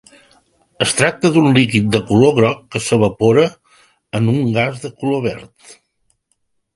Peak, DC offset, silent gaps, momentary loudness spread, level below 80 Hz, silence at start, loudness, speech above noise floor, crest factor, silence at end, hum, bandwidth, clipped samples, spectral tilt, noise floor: 0 dBFS; under 0.1%; none; 9 LU; -48 dBFS; 0.8 s; -15 LUFS; 52 dB; 16 dB; 1.3 s; none; 11.5 kHz; under 0.1%; -5.5 dB/octave; -67 dBFS